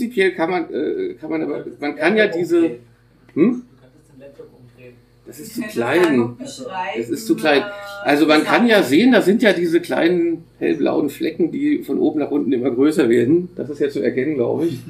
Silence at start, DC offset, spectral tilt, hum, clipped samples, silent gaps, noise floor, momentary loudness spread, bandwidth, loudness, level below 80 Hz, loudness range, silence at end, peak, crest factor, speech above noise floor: 0 s; under 0.1%; -5.5 dB/octave; none; under 0.1%; none; -48 dBFS; 12 LU; 15.5 kHz; -18 LUFS; -60 dBFS; 8 LU; 0 s; 0 dBFS; 18 dB; 31 dB